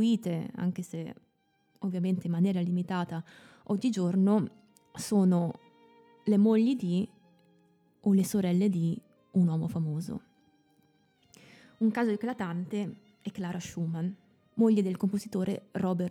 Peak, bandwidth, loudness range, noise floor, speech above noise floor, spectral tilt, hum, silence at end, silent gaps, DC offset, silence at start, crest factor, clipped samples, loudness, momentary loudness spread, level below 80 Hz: -14 dBFS; 14.5 kHz; 6 LU; -72 dBFS; 44 dB; -7.5 dB/octave; none; 0 s; none; under 0.1%; 0 s; 16 dB; under 0.1%; -30 LUFS; 15 LU; -72 dBFS